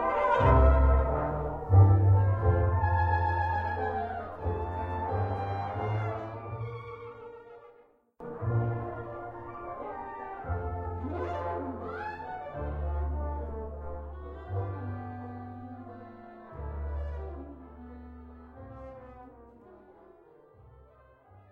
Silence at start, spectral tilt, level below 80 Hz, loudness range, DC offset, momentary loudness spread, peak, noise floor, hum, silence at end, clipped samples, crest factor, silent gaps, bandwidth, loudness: 0 s; -10 dB/octave; -36 dBFS; 17 LU; under 0.1%; 23 LU; -10 dBFS; -61 dBFS; none; 0.1 s; under 0.1%; 20 dB; none; 4.4 kHz; -30 LUFS